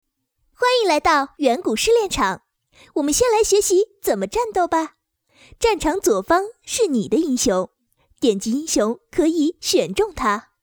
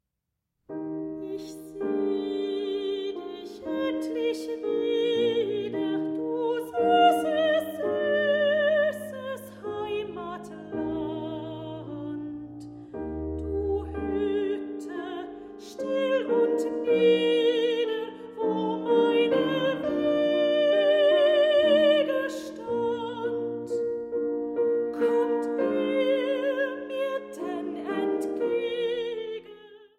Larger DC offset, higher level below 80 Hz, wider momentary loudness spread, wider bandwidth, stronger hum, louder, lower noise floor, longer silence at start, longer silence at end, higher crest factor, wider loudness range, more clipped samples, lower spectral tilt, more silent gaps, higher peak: neither; first, -44 dBFS vs -54 dBFS; second, 6 LU vs 15 LU; first, over 20 kHz vs 15.5 kHz; neither; first, -19 LUFS vs -27 LUFS; second, -69 dBFS vs -83 dBFS; about the same, 0.6 s vs 0.7 s; about the same, 0.2 s vs 0.15 s; about the same, 16 dB vs 16 dB; second, 2 LU vs 9 LU; neither; second, -3 dB/octave vs -5.5 dB/octave; neither; first, -4 dBFS vs -10 dBFS